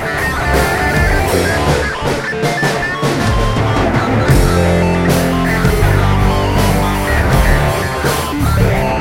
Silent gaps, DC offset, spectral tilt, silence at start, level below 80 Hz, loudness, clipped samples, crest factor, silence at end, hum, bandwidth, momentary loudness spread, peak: none; under 0.1%; -5.5 dB/octave; 0 s; -20 dBFS; -14 LUFS; under 0.1%; 12 dB; 0 s; none; 16.5 kHz; 4 LU; 0 dBFS